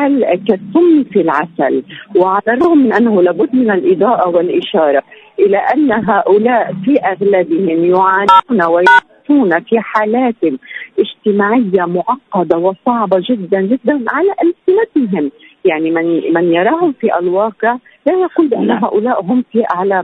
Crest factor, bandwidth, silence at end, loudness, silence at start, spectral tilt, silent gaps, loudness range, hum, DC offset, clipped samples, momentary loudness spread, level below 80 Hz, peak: 12 dB; 6.8 kHz; 0 s; -12 LUFS; 0 s; -7.5 dB/octave; none; 3 LU; none; under 0.1%; under 0.1%; 6 LU; -58 dBFS; 0 dBFS